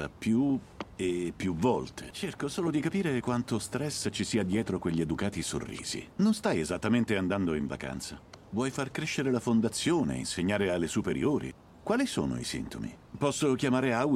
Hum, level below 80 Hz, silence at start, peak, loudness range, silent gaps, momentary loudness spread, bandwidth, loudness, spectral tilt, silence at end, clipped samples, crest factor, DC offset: none; -54 dBFS; 0 s; -14 dBFS; 2 LU; none; 10 LU; 15 kHz; -31 LUFS; -5 dB/octave; 0 s; under 0.1%; 16 dB; under 0.1%